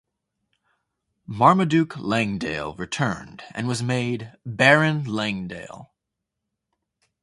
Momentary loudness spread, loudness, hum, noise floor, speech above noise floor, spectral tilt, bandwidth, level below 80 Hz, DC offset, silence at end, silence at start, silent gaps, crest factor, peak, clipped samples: 18 LU; -22 LUFS; none; -83 dBFS; 60 dB; -5.5 dB/octave; 11.5 kHz; -56 dBFS; under 0.1%; 1.4 s; 1.3 s; none; 24 dB; 0 dBFS; under 0.1%